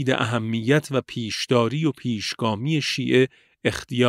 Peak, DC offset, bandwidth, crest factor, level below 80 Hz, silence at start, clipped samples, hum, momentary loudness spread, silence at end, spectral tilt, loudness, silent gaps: -4 dBFS; under 0.1%; 15.5 kHz; 18 dB; -56 dBFS; 0 s; under 0.1%; none; 7 LU; 0 s; -5.5 dB/octave; -23 LUFS; none